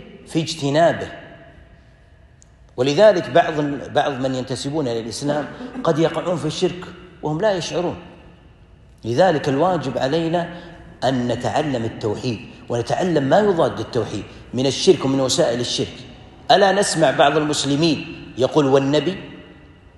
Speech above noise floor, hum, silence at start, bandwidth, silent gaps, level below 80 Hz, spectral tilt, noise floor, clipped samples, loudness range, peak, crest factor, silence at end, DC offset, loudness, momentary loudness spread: 30 dB; none; 0 s; 12 kHz; none; -50 dBFS; -5 dB/octave; -49 dBFS; under 0.1%; 5 LU; -2 dBFS; 18 dB; 0.3 s; under 0.1%; -19 LUFS; 15 LU